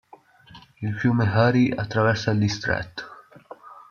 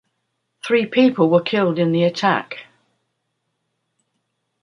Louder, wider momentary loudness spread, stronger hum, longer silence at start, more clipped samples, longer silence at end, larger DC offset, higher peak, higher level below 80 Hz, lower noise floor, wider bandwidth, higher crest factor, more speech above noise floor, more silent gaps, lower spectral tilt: second, -22 LUFS vs -18 LUFS; first, 20 LU vs 16 LU; neither; about the same, 0.55 s vs 0.65 s; neither; second, 0.1 s vs 2 s; neither; second, -6 dBFS vs -2 dBFS; first, -54 dBFS vs -68 dBFS; second, -51 dBFS vs -74 dBFS; second, 7 kHz vs 11 kHz; about the same, 18 dB vs 18 dB; second, 30 dB vs 57 dB; neither; about the same, -6.5 dB/octave vs -7 dB/octave